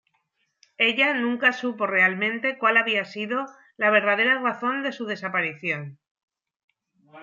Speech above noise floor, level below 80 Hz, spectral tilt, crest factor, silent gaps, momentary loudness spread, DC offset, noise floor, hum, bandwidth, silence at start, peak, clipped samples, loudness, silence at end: 49 dB; -82 dBFS; -5 dB/octave; 20 dB; 6.11-6.15 s, 6.23-6.28 s, 6.56-6.68 s; 10 LU; under 0.1%; -73 dBFS; none; 7.4 kHz; 0.8 s; -6 dBFS; under 0.1%; -22 LUFS; 0 s